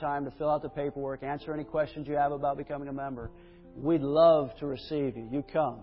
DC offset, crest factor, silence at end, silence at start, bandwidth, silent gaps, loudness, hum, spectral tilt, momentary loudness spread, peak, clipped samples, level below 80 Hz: under 0.1%; 20 dB; 0 s; 0 s; 5.6 kHz; none; -30 LUFS; none; -6 dB/octave; 14 LU; -10 dBFS; under 0.1%; -56 dBFS